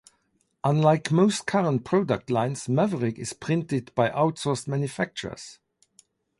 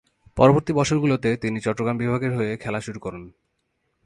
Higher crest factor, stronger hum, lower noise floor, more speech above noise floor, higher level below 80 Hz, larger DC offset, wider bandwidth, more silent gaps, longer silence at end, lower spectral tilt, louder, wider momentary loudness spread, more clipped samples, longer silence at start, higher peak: about the same, 18 dB vs 22 dB; neither; about the same, -71 dBFS vs -73 dBFS; second, 46 dB vs 51 dB; second, -62 dBFS vs -48 dBFS; neither; about the same, 11.5 kHz vs 11.5 kHz; neither; about the same, 0.85 s vs 0.75 s; about the same, -6 dB/octave vs -6.5 dB/octave; second, -25 LUFS vs -22 LUFS; second, 9 LU vs 17 LU; neither; first, 0.65 s vs 0.35 s; second, -6 dBFS vs 0 dBFS